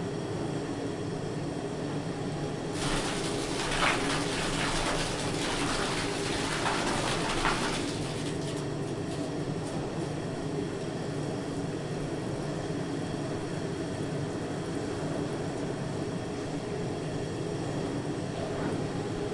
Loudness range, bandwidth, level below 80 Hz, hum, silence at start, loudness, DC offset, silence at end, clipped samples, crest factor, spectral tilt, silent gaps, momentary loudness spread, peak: 5 LU; 11.5 kHz; -46 dBFS; none; 0 s; -32 LUFS; under 0.1%; 0 s; under 0.1%; 20 dB; -4.5 dB/octave; none; 6 LU; -12 dBFS